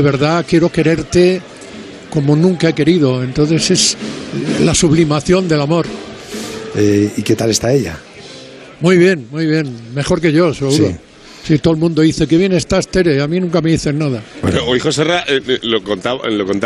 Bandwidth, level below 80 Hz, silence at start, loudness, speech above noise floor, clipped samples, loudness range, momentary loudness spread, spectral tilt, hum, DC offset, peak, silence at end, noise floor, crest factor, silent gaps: 13.5 kHz; -38 dBFS; 0 s; -14 LUFS; 21 dB; under 0.1%; 2 LU; 13 LU; -5 dB/octave; none; under 0.1%; 0 dBFS; 0 s; -34 dBFS; 14 dB; none